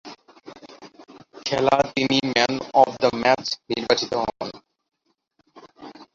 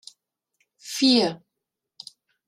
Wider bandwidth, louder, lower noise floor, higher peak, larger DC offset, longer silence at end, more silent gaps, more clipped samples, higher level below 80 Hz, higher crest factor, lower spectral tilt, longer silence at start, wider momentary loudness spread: second, 7.8 kHz vs 15 kHz; about the same, -21 LUFS vs -21 LUFS; second, -68 dBFS vs -84 dBFS; first, -2 dBFS vs -6 dBFS; neither; second, 0.1 s vs 1.1 s; neither; neither; first, -58 dBFS vs -70 dBFS; about the same, 22 dB vs 20 dB; about the same, -4 dB/octave vs -3.5 dB/octave; second, 0.05 s vs 0.85 s; second, 15 LU vs 25 LU